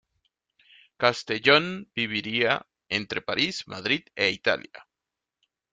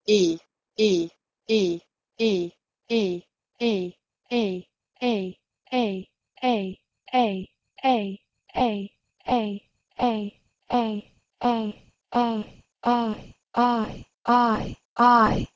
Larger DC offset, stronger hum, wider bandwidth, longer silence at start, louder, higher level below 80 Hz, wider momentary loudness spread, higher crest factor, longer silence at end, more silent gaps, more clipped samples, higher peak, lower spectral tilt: neither; neither; first, 9.4 kHz vs 7.6 kHz; first, 1 s vs 0.05 s; about the same, -25 LUFS vs -25 LUFS; second, -66 dBFS vs -52 dBFS; second, 10 LU vs 15 LU; about the same, 24 dB vs 20 dB; first, 0.9 s vs 0.1 s; second, none vs 14.85-14.96 s; neither; about the same, -4 dBFS vs -6 dBFS; second, -4 dB/octave vs -5.5 dB/octave